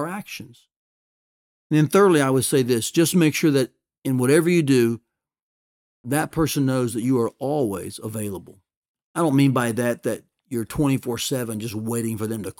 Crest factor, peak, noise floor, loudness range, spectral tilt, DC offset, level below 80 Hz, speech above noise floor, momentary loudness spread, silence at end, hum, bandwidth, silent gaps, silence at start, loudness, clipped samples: 18 dB; -4 dBFS; under -90 dBFS; 6 LU; -5.5 dB/octave; under 0.1%; -54 dBFS; over 69 dB; 14 LU; 0.1 s; none; 18 kHz; 0.76-1.70 s, 3.98-4.02 s, 5.42-6.04 s, 8.77-8.82 s, 8.88-8.95 s, 9.03-9.14 s; 0 s; -21 LUFS; under 0.1%